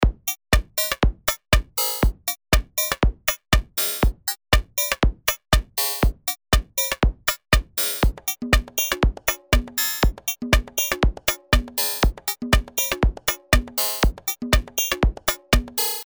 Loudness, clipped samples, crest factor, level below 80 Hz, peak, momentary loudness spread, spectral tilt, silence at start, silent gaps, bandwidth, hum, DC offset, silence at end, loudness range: -22 LUFS; under 0.1%; 22 dB; -26 dBFS; 0 dBFS; 4 LU; -3.5 dB/octave; 0 s; none; over 20 kHz; none; under 0.1%; 0 s; 0 LU